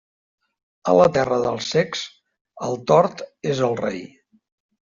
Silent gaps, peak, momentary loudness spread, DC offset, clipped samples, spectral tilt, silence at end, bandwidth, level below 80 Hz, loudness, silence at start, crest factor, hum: 2.41-2.45 s; -4 dBFS; 14 LU; under 0.1%; under 0.1%; -5.5 dB/octave; 0.75 s; 7.6 kHz; -58 dBFS; -21 LUFS; 0.85 s; 18 dB; none